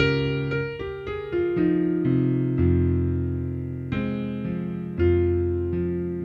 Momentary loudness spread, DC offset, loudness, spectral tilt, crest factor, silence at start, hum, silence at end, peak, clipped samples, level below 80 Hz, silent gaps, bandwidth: 9 LU; under 0.1%; -25 LUFS; -9.5 dB/octave; 18 dB; 0 s; none; 0 s; -6 dBFS; under 0.1%; -40 dBFS; none; 5.8 kHz